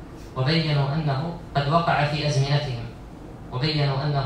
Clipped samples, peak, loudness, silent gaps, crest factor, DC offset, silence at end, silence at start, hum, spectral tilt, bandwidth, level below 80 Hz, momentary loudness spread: under 0.1%; -6 dBFS; -24 LUFS; none; 18 dB; under 0.1%; 0 s; 0 s; none; -6.5 dB/octave; 9.4 kHz; -44 dBFS; 15 LU